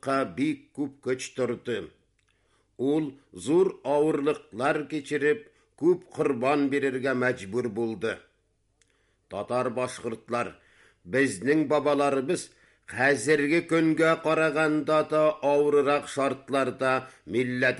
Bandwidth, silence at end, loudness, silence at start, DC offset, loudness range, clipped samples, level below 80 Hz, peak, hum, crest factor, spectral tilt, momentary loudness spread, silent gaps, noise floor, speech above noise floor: 11.5 kHz; 0 s; -26 LUFS; 0.05 s; under 0.1%; 8 LU; under 0.1%; -68 dBFS; -12 dBFS; none; 16 dB; -5.5 dB/octave; 10 LU; none; -71 dBFS; 45 dB